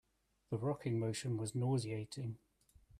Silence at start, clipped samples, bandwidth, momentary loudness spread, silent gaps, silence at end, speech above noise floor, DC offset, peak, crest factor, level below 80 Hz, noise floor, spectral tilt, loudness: 0.5 s; under 0.1%; 14 kHz; 9 LU; none; 0 s; 28 dB; under 0.1%; -26 dBFS; 14 dB; -70 dBFS; -66 dBFS; -6.5 dB/octave; -40 LUFS